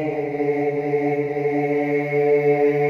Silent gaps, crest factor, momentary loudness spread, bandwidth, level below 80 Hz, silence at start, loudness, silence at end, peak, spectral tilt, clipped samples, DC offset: none; 12 dB; 5 LU; 6.2 kHz; -64 dBFS; 0 s; -21 LUFS; 0 s; -8 dBFS; -9 dB/octave; under 0.1%; under 0.1%